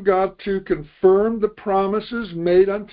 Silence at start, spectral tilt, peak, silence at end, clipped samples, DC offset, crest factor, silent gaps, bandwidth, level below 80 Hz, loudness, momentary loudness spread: 0 s; -11.5 dB/octave; -4 dBFS; 0.05 s; under 0.1%; under 0.1%; 16 dB; none; 5 kHz; -48 dBFS; -20 LUFS; 9 LU